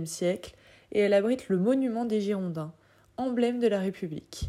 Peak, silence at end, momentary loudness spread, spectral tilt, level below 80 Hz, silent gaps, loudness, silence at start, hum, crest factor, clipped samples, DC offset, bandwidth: -12 dBFS; 0 s; 13 LU; -6 dB/octave; -58 dBFS; none; -28 LUFS; 0 s; none; 16 dB; under 0.1%; under 0.1%; 15 kHz